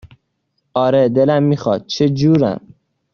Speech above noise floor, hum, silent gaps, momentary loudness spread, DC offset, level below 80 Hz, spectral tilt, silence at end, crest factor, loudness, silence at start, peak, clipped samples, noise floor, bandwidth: 55 dB; none; none; 7 LU; under 0.1%; -52 dBFS; -7 dB/octave; 0.55 s; 14 dB; -15 LUFS; 0.05 s; -2 dBFS; under 0.1%; -69 dBFS; 7 kHz